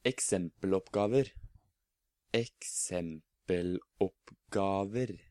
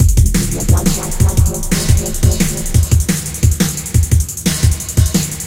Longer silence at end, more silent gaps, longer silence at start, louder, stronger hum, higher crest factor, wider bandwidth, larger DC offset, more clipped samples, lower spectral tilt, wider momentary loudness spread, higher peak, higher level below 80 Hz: first, 0.15 s vs 0 s; neither; about the same, 0.05 s vs 0 s; second, -34 LUFS vs -14 LUFS; neither; first, 20 dB vs 12 dB; second, 14 kHz vs 17 kHz; second, under 0.1% vs 0.4%; neither; about the same, -4.5 dB/octave vs -4.5 dB/octave; first, 8 LU vs 3 LU; second, -16 dBFS vs 0 dBFS; second, -62 dBFS vs -18 dBFS